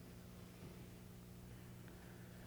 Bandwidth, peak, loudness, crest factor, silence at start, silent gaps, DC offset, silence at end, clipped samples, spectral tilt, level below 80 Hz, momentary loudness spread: over 20 kHz; -44 dBFS; -57 LUFS; 14 dB; 0 s; none; under 0.1%; 0 s; under 0.1%; -5.5 dB/octave; -66 dBFS; 1 LU